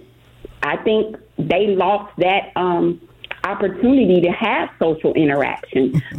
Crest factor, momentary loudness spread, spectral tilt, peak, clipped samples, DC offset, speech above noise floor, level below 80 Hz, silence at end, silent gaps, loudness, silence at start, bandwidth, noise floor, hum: 14 dB; 10 LU; -8 dB/octave; -4 dBFS; under 0.1%; under 0.1%; 24 dB; -50 dBFS; 0 s; none; -18 LUFS; 0.45 s; 6.2 kHz; -42 dBFS; none